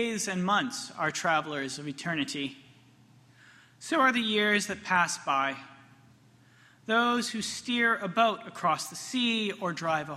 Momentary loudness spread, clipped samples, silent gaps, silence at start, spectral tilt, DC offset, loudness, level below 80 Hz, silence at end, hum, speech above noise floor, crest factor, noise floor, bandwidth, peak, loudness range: 10 LU; under 0.1%; none; 0 s; -3 dB/octave; under 0.1%; -28 LUFS; -72 dBFS; 0 s; none; 30 dB; 20 dB; -59 dBFS; 14 kHz; -10 dBFS; 3 LU